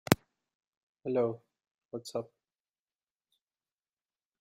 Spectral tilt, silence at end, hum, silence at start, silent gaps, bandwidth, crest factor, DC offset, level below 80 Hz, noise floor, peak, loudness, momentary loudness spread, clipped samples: -5 dB/octave; 2.15 s; none; 0.1 s; 0.55-0.60 s, 0.67-0.93 s, 1.71-1.78 s, 1.85-1.89 s; 13.5 kHz; 38 dB; under 0.1%; -68 dBFS; under -90 dBFS; 0 dBFS; -34 LUFS; 17 LU; under 0.1%